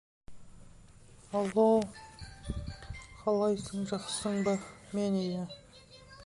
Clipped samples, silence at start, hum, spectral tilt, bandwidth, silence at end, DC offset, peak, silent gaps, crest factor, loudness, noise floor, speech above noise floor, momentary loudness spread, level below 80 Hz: under 0.1%; 0.3 s; none; -5.5 dB/octave; 11.5 kHz; 0 s; under 0.1%; -14 dBFS; none; 20 dB; -32 LUFS; -55 dBFS; 25 dB; 21 LU; -52 dBFS